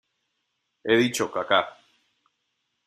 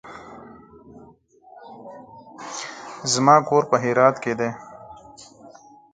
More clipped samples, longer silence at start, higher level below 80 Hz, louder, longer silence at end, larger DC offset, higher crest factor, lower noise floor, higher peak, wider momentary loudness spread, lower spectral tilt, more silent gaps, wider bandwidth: neither; first, 0.85 s vs 0.05 s; second, -70 dBFS vs -64 dBFS; second, -23 LUFS vs -20 LUFS; first, 1.15 s vs 1 s; neither; about the same, 22 dB vs 24 dB; first, -77 dBFS vs -51 dBFS; second, -6 dBFS vs 0 dBFS; second, 14 LU vs 28 LU; about the same, -3.5 dB/octave vs -4 dB/octave; neither; first, 14.5 kHz vs 9.6 kHz